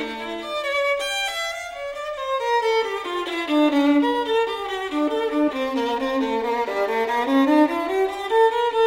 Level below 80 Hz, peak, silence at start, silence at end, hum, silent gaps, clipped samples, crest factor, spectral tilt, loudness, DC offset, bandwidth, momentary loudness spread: -56 dBFS; -8 dBFS; 0 s; 0 s; none; none; under 0.1%; 14 dB; -3 dB/octave; -22 LUFS; under 0.1%; 16 kHz; 9 LU